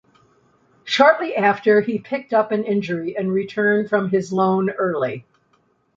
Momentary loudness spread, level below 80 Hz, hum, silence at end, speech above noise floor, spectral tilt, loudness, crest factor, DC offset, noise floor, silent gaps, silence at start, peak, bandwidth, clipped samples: 9 LU; -64 dBFS; none; 0.75 s; 44 dB; -6 dB/octave; -19 LUFS; 18 dB; under 0.1%; -63 dBFS; none; 0.85 s; -2 dBFS; 7.8 kHz; under 0.1%